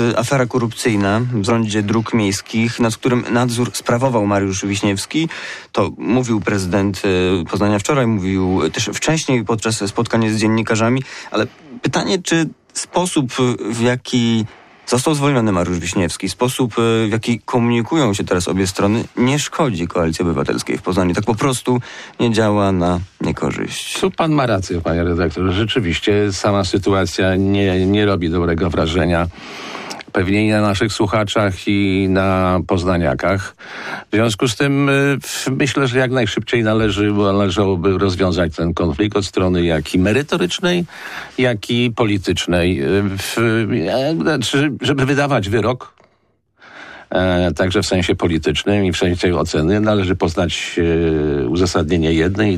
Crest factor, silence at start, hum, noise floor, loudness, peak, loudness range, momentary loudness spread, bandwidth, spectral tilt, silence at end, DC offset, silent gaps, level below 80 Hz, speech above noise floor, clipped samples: 12 dB; 0 s; none; -61 dBFS; -17 LUFS; -6 dBFS; 2 LU; 5 LU; 15 kHz; -5.5 dB/octave; 0 s; under 0.1%; none; -40 dBFS; 45 dB; under 0.1%